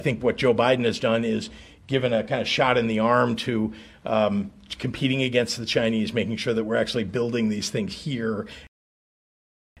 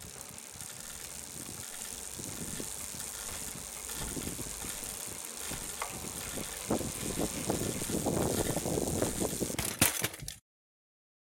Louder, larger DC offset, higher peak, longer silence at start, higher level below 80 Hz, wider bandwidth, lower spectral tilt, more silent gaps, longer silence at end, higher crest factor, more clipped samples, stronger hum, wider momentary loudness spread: first, -24 LUFS vs -35 LUFS; neither; first, -6 dBFS vs -10 dBFS; about the same, 0 s vs 0 s; about the same, -54 dBFS vs -52 dBFS; second, 13 kHz vs 17 kHz; first, -5.5 dB/octave vs -3 dB/octave; neither; first, 1.15 s vs 0.9 s; second, 20 dB vs 28 dB; neither; neither; about the same, 9 LU vs 10 LU